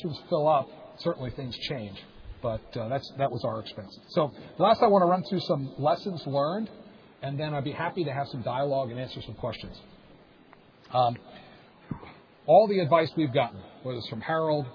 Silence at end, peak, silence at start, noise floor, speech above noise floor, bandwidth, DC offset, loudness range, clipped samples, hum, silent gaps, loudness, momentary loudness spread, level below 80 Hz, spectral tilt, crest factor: 0 s; -8 dBFS; 0 s; -55 dBFS; 28 dB; 5.4 kHz; under 0.1%; 7 LU; under 0.1%; none; none; -28 LUFS; 19 LU; -58 dBFS; -8 dB/octave; 20 dB